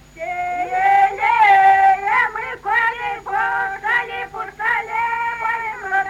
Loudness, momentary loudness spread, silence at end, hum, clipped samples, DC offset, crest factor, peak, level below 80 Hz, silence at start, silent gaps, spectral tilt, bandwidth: -17 LUFS; 13 LU; 0 s; none; under 0.1%; under 0.1%; 16 dB; -2 dBFS; -52 dBFS; 0.15 s; none; -3 dB/octave; 12.5 kHz